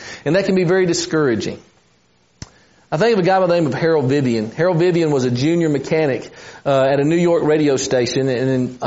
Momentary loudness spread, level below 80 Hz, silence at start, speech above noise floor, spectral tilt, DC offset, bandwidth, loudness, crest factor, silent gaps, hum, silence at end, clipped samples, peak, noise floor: 5 LU; -54 dBFS; 0 s; 41 dB; -5.5 dB/octave; under 0.1%; 8 kHz; -17 LUFS; 14 dB; none; none; 0 s; under 0.1%; -4 dBFS; -58 dBFS